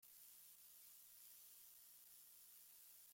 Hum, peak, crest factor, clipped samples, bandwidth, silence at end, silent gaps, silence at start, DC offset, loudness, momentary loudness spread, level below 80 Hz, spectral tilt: 50 Hz at -95 dBFS; -50 dBFS; 16 dB; under 0.1%; 16.5 kHz; 0 s; none; 0 s; under 0.1%; -62 LUFS; 1 LU; under -90 dBFS; 1.5 dB/octave